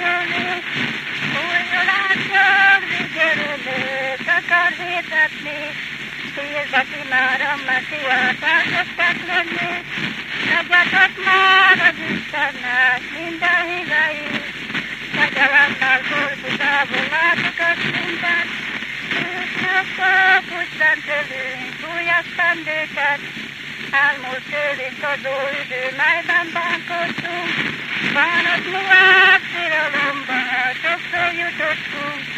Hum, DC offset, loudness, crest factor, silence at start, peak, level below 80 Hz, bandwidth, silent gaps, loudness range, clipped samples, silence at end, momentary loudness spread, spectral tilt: none; under 0.1%; -17 LUFS; 18 dB; 0 s; 0 dBFS; -58 dBFS; 15 kHz; none; 5 LU; under 0.1%; 0 s; 11 LU; -3 dB/octave